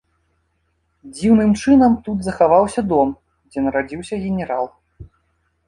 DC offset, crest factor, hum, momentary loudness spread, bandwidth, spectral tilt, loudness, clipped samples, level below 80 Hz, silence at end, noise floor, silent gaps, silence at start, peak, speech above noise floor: under 0.1%; 16 dB; none; 13 LU; 11.5 kHz; -7 dB/octave; -17 LUFS; under 0.1%; -44 dBFS; 0.65 s; -67 dBFS; none; 1.05 s; -2 dBFS; 50 dB